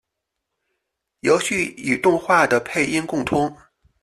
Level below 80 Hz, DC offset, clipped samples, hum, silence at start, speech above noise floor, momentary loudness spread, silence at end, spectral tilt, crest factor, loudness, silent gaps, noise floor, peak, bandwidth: -54 dBFS; under 0.1%; under 0.1%; none; 1.25 s; 61 dB; 6 LU; 0.5 s; -4.5 dB/octave; 18 dB; -20 LUFS; none; -80 dBFS; -4 dBFS; 13.5 kHz